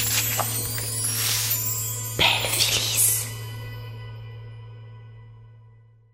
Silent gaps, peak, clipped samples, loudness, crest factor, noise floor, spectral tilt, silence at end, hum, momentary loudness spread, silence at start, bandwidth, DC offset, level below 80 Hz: none; -6 dBFS; under 0.1%; -21 LUFS; 22 dB; -52 dBFS; -1 dB/octave; 0.45 s; none; 22 LU; 0 s; 16.5 kHz; under 0.1%; -50 dBFS